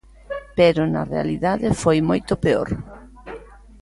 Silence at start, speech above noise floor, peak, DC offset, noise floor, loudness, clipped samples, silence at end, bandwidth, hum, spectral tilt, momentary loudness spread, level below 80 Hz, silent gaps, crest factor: 0.3 s; 21 dB; -4 dBFS; under 0.1%; -40 dBFS; -20 LUFS; under 0.1%; 0.25 s; 11.5 kHz; none; -6.5 dB/octave; 21 LU; -42 dBFS; none; 18 dB